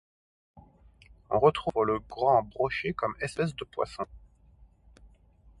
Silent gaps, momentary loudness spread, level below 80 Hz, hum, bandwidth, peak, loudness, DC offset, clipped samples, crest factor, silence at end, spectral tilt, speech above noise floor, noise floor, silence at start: none; 10 LU; -56 dBFS; none; 11.5 kHz; -8 dBFS; -29 LUFS; under 0.1%; under 0.1%; 22 dB; 0.55 s; -6 dB/octave; 31 dB; -59 dBFS; 0.55 s